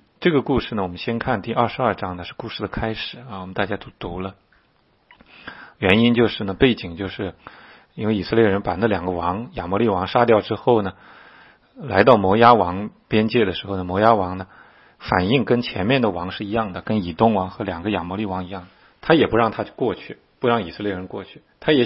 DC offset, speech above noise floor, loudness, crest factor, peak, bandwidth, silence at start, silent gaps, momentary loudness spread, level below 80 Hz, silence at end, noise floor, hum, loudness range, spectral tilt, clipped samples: under 0.1%; 41 dB; -20 LUFS; 20 dB; 0 dBFS; 5.8 kHz; 0.2 s; none; 15 LU; -46 dBFS; 0 s; -61 dBFS; none; 7 LU; -9 dB/octave; under 0.1%